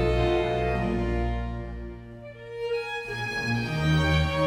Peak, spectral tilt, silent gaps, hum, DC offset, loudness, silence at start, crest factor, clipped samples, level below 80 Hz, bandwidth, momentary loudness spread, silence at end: -12 dBFS; -6.5 dB/octave; none; none; under 0.1%; -27 LUFS; 0 s; 14 dB; under 0.1%; -34 dBFS; 13 kHz; 16 LU; 0 s